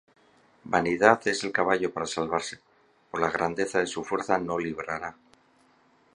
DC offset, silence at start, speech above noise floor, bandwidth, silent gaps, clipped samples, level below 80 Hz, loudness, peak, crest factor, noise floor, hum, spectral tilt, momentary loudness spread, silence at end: under 0.1%; 0.65 s; 36 dB; 11.5 kHz; none; under 0.1%; -62 dBFS; -27 LUFS; -2 dBFS; 26 dB; -63 dBFS; none; -4 dB/octave; 13 LU; 1 s